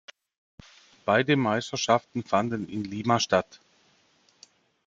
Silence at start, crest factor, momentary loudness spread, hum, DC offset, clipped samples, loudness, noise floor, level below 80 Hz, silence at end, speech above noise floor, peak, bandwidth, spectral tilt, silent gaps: 1.05 s; 22 dB; 10 LU; none; under 0.1%; under 0.1%; -26 LUFS; -64 dBFS; -66 dBFS; 1.45 s; 39 dB; -6 dBFS; 7.8 kHz; -4.5 dB/octave; none